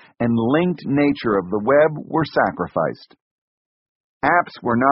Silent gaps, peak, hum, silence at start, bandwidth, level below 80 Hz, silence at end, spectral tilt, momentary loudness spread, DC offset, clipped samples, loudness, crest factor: 3.21-4.20 s; -2 dBFS; none; 0.2 s; 5.8 kHz; -54 dBFS; 0 s; -5.5 dB/octave; 7 LU; under 0.1%; under 0.1%; -19 LUFS; 18 dB